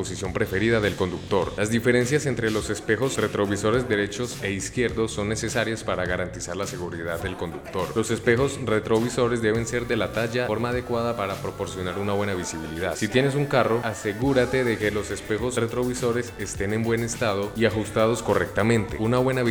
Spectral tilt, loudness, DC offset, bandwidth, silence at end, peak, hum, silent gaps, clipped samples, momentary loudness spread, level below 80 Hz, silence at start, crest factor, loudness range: -5 dB/octave; -25 LUFS; under 0.1%; over 20 kHz; 0 s; -4 dBFS; none; none; under 0.1%; 8 LU; -46 dBFS; 0 s; 20 dB; 3 LU